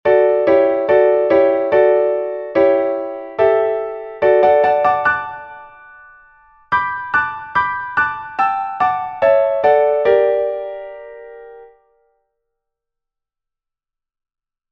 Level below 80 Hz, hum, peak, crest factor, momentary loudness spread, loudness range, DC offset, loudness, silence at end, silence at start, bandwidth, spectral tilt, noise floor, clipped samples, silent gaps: -56 dBFS; none; -2 dBFS; 16 dB; 13 LU; 6 LU; under 0.1%; -15 LUFS; 3.05 s; 0.05 s; 5.6 kHz; -7 dB/octave; -85 dBFS; under 0.1%; none